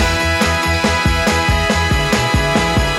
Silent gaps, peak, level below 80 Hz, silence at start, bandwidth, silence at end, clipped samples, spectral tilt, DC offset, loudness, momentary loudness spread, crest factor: none; -2 dBFS; -22 dBFS; 0 s; 16 kHz; 0 s; under 0.1%; -4 dB/octave; under 0.1%; -14 LUFS; 0 LU; 12 dB